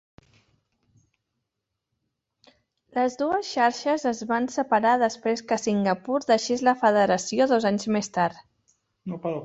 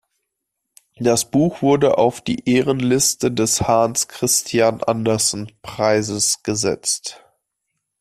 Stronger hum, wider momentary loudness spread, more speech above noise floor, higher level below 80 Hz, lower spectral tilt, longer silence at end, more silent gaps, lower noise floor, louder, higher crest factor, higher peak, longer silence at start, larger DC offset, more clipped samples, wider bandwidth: neither; about the same, 7 LU vs 6 LU; about the same, 59 dB vs 60 dB; second, -66 dBFS vs -52 dBFS; about the same, -4.5 dB/octave vs -3.5 dB/octave; second, 0 s vs 0.85 s; neither; first, -83 dBFS vs -78 dBFS; second, -24 LUFS vs -18 LUFS; about the same, 18 dB vs 16 dB; second, -8 dBFS vs -2 dBFS; first, 2.95 s vs 1 s; neither; neither; second, 8.2 kHz vs 15 kHz